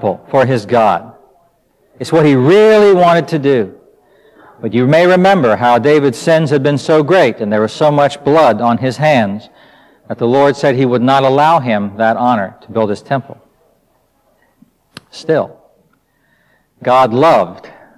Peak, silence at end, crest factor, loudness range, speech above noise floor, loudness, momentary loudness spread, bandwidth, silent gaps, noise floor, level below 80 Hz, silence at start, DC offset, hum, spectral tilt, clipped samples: -2 dBFS; 0.3 s; 12 dB; 10 LU; 46 dB; -11 LUFS; 11 LU; 13.5 kHz; none; -57 dBFS; -54 dBFS; 0 s; under 0.1%; none; -6.5 dB/octave; under 0.1%